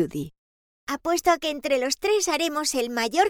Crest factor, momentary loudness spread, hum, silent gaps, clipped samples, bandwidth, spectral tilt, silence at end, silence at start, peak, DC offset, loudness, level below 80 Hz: 18 dB; 12 LU; none; 0.38-0.87 s; under 0.1%; over 20 kHz; -2.5 dB/octave; 0 s; 0 s; -6 dBFS; under 0.1%; -24 LUFS; -58 dBFS